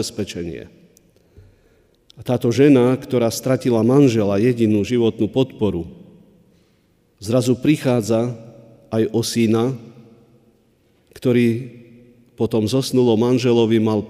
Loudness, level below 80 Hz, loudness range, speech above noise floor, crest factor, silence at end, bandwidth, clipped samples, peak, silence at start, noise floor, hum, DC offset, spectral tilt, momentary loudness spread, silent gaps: -18 LUFS; -54 dBFS; 6 LU; 42 dB; 16 dB; 0 s; 15.5 kHz; under 0.1%; -2 dBFS; 0 s; -59 dBFS; none; under 0.1%; -6.5 dB/octave; 14 LU; none